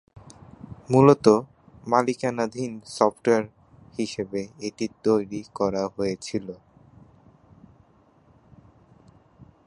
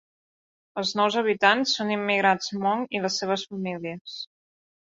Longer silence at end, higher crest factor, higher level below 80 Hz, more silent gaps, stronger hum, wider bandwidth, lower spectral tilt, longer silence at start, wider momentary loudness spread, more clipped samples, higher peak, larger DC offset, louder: second, 0.25 s vs 0.65 s; about the same, 24 dB vs 24 dB; first, -60 dBFS vs -72 dBFS; second, none vs 4.01-4.05 s; neither; first, 11 kHz vs 7.8 kHz; first, -6.5 dB/octave vs -3.5 dB/octave; about the same, 0.7 s vs 0.75 s; first, 23 LU vs 16 LU; neither; first, 0 dBFS vs -4 dBFS; neither; about the same, -24 LUFS vs -24 LUFS